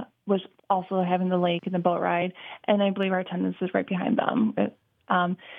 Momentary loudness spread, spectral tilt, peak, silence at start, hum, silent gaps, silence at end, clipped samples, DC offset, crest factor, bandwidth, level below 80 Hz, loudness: 5 LU; -9.5 dB/octave; -6 dBFS; 0 s; none; none; 0 s; under 0.1%; under 0.1%; 20 dB; 3.8 kHz; -78 dBFS; -26 LUFS